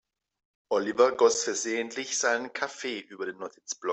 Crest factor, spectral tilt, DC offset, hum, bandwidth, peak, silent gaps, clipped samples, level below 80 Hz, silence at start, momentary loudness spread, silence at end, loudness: 20 dB; -1.5 dB/octave; under 0.1%; none; 8.4 kHz; -8 dBFS; none; under 0.1%; -76 dBFS; 0.7 s; 14 LU; 0 s; -28 LUFS